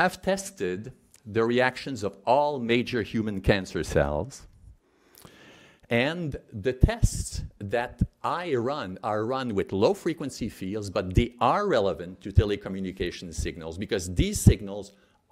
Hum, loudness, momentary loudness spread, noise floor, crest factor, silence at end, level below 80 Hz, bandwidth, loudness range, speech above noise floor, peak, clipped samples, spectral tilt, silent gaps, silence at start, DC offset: none; -27 LUFS; 11 LU; -58 dBFS; 24 dB; 0.45 s; -38 dBFS; 15.5 kHz; 3 LU; 31 dB; -4 dBFS; under 0.1%; -5.5 dB/octave; none; 0 s; under 0.1%